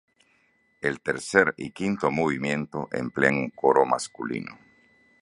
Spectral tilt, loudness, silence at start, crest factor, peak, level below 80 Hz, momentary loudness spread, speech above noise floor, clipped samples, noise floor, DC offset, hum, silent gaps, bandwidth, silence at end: -5 dB/octave; -25 LUFS; 0.8 s; 24 dB; -2 dBFS; -60 dBFS; 10 LU; 41 dB; under 0.1%; -66 dBFS; under 0.1%; none; none; 11.5 kHz; 0.65 s